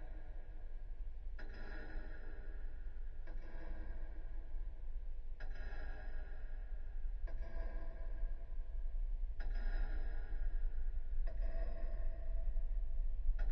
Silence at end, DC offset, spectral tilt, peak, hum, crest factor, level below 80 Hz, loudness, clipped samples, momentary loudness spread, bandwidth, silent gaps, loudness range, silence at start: 0 s; under 0.1%; -6.5 dB/octave; -24 dBFS; none; 14 dB; -40 dBFS; -49 LUFS; under 0.1%; 8 LU; 5.2 kHz; none; 6 LU; 0 s